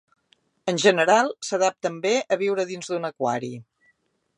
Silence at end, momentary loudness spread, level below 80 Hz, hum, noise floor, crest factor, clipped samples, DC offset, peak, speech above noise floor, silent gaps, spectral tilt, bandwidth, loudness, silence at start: 0.75 s; 11 LU; -78 dBFS; none; -67 dBFS; 20 dB; under 0.1%; under 0.1%; -4 dBFS; 45 dB; none; -3.5 dB/octave; 11 kHz; -23 LUFS; 0.65 s